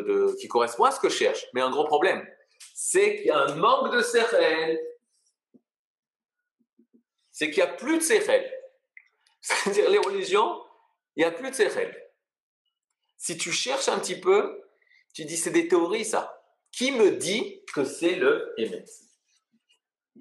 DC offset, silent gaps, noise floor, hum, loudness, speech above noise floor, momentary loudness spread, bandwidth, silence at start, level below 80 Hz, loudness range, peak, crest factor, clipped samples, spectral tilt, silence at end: under 0.1%; 5.79-6.03 s, 12.40-12.65 s, 12.84-12.88 s; -80 dBFS; none; -25 LUFS; 56 dB; 13 LU; 12.5 kHz; 0 s; -90 dBFS; 5 LU; -8 dBFS; 20 dB; under 0.1%; -2.5 dB/octave; 1.25 s